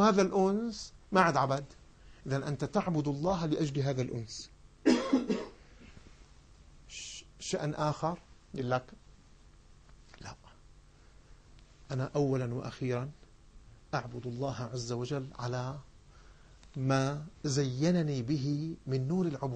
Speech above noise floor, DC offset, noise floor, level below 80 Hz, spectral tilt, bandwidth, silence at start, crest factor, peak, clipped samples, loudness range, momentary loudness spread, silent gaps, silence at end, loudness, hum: 26 dB; under 0.1%; -58 dBFS; -58 dBFS; -6 dB/octave; 9.4 kHz; 0 s; 22 dB; -12 dBFS; under 0.1%; 7 LU; 16 LU; none; 0 s; -33 LUFS; none